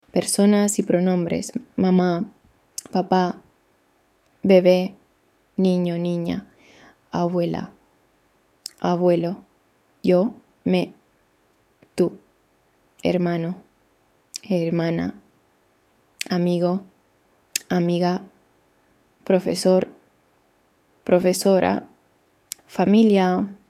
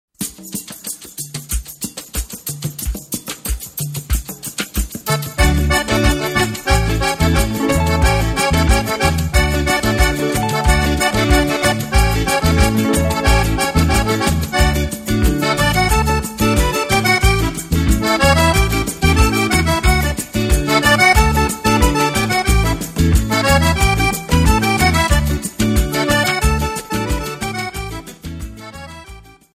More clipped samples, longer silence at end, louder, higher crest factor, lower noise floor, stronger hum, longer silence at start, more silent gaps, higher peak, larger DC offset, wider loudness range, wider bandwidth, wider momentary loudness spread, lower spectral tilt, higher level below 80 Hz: neither; second, 0.15 s vs 0.35 s; second, -21 LUFS vs -16 LUFS; about the same, 20 dB vs 16 dB; first, -63 dBFS vs -39 dBFS; neither; about the same, 0.15 s vs 0.2 s; neither; about the same, -2 dBFS vs 0 dBFS; neither; second, 5 LU vs 9 LU; about the same, 15.5 kHz vs 16 kHz; first, 16 LU vs 12 LU; first, -6 dB/octave vs -4.5 dB/octave; second, -62 dBFS vs -22 dBFS